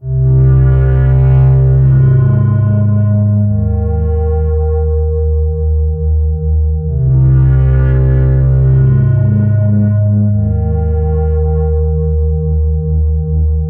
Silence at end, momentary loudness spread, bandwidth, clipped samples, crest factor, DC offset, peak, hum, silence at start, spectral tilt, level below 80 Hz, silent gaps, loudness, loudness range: 0 s; 6 LU; 2.4 kHz; under 0.1%; 10 dB; under 0.1%; 0 dBFS; none; 0 s; -13.5 dB/octave; -16 dBFS; none; -12 LUFS; 4 LU